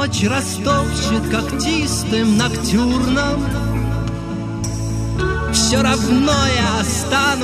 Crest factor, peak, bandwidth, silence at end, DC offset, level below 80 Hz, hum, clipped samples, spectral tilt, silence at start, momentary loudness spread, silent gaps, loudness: 14 dB; -4 dBFS; 15 kHz; 0 s; under 0.1%; -28 dBFS; none; under 0.1%; -4.5 dB/octave; 0 s; 8 LU; none; -17 LUFS